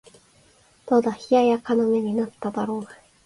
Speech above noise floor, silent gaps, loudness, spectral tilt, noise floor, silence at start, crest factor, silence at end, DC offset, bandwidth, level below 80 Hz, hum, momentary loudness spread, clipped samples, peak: 35 dB; none; -23 LUFS; -6.5 dB/octave; -57 dBFS; 0.85 s; 16 dB; 0.3 s; under 0.1%; 11.5 kHz; -64 dBFS; none; 10 LU; under 0.1%; -8 dBFS